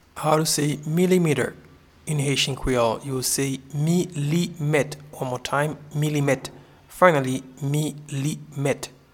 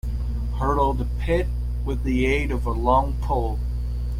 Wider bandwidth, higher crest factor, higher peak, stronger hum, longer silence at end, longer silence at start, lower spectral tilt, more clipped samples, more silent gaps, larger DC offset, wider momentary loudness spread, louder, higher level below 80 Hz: first, 17.5 kHz vs 10.5 kHz; first, 24 dB vs 16 dB; first, 0 dBFS vs -8 dBFS; second, none vs 60 Hz at -25 dBFS; first, 0.25 s vs 0 s; about the same, 0.15 s vs 0.05 s; second, -5 dB/octave vs -7.5 dB/octave; neither; neither; neither; about the same, 10 LU vs 8 LU; about the same, -23 LUFS vs -24 LUFS; second, -48 dBFS vs -26 dBFS